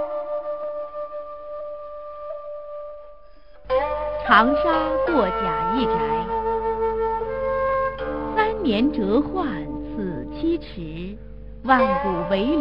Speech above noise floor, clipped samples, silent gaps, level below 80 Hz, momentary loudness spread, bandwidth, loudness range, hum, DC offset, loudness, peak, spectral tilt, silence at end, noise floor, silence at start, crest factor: 28 dB; under 0.1%; none; -42 dBFS; 16 LU; 5.6 kHz; 10 LU; none; 0.6%; -23 LUFS; -2 dBFS; -8.5 dB/octave; 0 s; -49 dBFS; 0 s; 22 dB